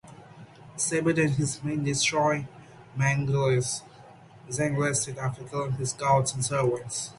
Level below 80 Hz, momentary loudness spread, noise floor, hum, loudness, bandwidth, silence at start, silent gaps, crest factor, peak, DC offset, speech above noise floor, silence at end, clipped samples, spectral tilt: -58 dBFS; 9 LU; -50 dBFS; none; -27 LUFS; 11.5 kHz; 0.05 s; none; 18 dB; -10 dBFS; under 0.1%; 24 dB; 0.05 s; under 0.1%; -4.5 dB/octave